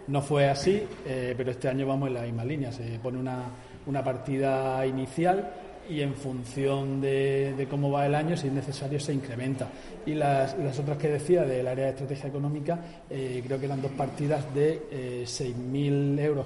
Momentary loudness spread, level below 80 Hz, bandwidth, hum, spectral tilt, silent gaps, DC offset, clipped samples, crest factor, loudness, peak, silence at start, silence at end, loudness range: 9 LU; -56 dBFS; 11.5 kHz; none; -7 dB/octave; none; under 0.1%; under 0.1%; 18 dB; -29 LUFS; -10 dBFS; 0 s; 0 s; 2 LU